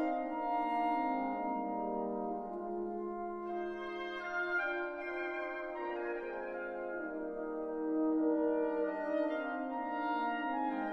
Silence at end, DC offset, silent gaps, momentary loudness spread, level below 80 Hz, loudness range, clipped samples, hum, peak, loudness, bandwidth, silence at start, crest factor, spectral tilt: 0 s; under 0.1%; none; 7 LU; -68 dBFS; 4 LU; under 0.1%; none; -22 dBFS; -37 LUFS; 6 kHz; 0 s; 14 dB; -7 dB/octave